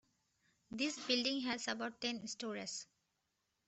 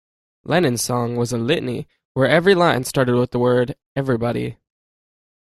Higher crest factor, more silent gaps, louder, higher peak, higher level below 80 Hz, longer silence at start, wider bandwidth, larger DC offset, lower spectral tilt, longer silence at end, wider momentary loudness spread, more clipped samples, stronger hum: about the same, 22 dB vs 18 dB; second, none vs 2.05-2.15 s, 3.86-3.95 s; second, -40 LUFS vs -19 LUFS; second, -20 dBFS vs -2 dBFS; second, -80 dBFS vs -52 dBFS; first, 0.7 s vs 0.45 s; second, 8.2 kHz vs 14.5 kHz; neither; second, -2 dB/octave vs -5.5 dB/octave; about the same, 0.85 s vs 0.9 s; about the same, 12 LU vs 11 LU; neither; neither